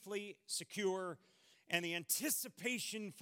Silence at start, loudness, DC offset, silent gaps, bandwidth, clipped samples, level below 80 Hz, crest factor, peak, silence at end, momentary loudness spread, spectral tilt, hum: 0 s; -40 LUFS; under 0.1%; none; 17.5 kHz; under 0.1%; under -90 dBFS; 24 dB; -20 dBFS; 0 s; 9 LU; -2 dB/octave; none